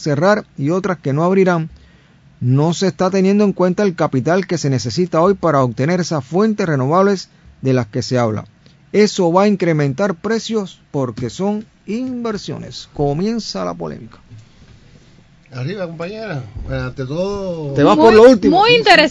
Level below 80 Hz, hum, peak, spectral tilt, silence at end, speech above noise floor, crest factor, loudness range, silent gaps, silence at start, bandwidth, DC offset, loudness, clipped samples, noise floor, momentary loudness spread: -44 dBFS; none; 0 dBFS; -6 dB/octave; 0 s; 33 dB; 16 dB; 11 LU; none; 0 s; 11 kHz; under 0.1%; -16 LUFS; 0.2%; -48 dBFS; 16 LU